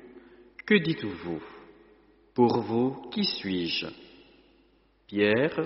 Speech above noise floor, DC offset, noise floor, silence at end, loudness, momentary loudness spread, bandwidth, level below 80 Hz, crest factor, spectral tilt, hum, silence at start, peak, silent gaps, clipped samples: 37 dB; under 0.1%; -64 dBFS; 0 s; -27 LUFS; 14 LU; 6 kHz; -64 dBFS; 20 dB; -4 dB/octave; none; 0 s; -8 dBFS; none; under 0.1%